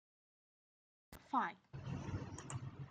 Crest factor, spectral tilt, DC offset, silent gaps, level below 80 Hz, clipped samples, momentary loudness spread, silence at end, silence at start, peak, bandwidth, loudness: 22 dB; -5.5 dB/octave; under 0.1%; none; -66 dBFS; under 0.1%; 15 LU; 0 s; 1.1 s; -24 dBFS; 9 kHz; -45 LUFS